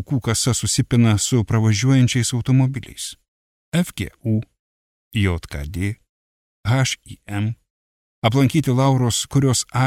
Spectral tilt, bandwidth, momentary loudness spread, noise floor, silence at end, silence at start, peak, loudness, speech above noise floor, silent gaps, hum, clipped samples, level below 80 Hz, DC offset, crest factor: -5 dB/octave; 15.5 kHz; 13 LU; under -90 dBFS; 0 s; 0 s; -4 dBFS; -20 LUFS; over 71 dB; 3.28-3.72 s, 4.59-5.11 s, 6.09-6.63 s, 7.70-8.22 s; none; under 0.1%; -42 dBFS; under 0.1%; 16 dB